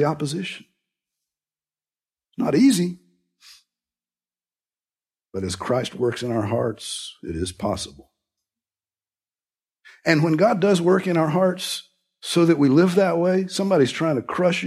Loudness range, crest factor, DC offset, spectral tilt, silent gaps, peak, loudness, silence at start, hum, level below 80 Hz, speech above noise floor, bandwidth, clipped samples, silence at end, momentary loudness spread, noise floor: 11 LU; 20 dB; under 0.1%; -5.5 dB/octave; none; -2 dBFS; -21 LUFS; 0 s; none; -56 dBFS; over 70 dB; 14.5 kHz; under 0.1%; 0 s; 14 LU; under -90 dBFS